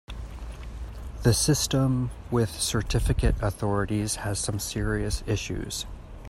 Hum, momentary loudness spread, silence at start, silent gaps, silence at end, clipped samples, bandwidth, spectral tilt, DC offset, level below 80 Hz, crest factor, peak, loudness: none; 17 LU; 0.1 s; none; 0 s; under 0.1%; 16 kHz; -4.5 dB/octave; under 0.1%; -34 dBFS; 20 dB; -8 dBFS; -27 LUFS